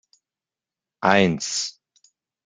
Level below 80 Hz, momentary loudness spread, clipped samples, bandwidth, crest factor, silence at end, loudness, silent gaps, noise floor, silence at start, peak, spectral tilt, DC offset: -64 dBFS; 9 LU; under 0.1%; 9.6 kHz; 24 dB; 0.75 s; -21 LUFS; none; -90 dBFS; 1 s; -2 dBFS; -4 dB/octave; under 0.1%